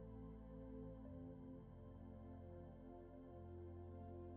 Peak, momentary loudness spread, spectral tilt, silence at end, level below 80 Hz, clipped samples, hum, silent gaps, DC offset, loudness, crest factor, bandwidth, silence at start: -44 dBFS; 4 LU; -9 dB/octave; 0 s; -64 dBFS; under 0.1%; none; none; under 0.1%; -58 LUFS; 12 dB; 3.6 kHz; 0 s